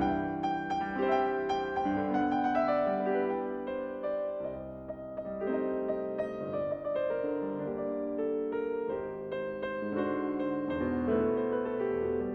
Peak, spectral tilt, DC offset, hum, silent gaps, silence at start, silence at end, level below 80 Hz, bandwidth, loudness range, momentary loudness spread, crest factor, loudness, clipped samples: -16 dBFS; -8 dB/octave; under 0.1%; none; none; 0 s; 0 s; -58 dBFS; 6.6 kHz; 4 LU; 8 LU; 16 dB; -33 LUFS; under 0.1%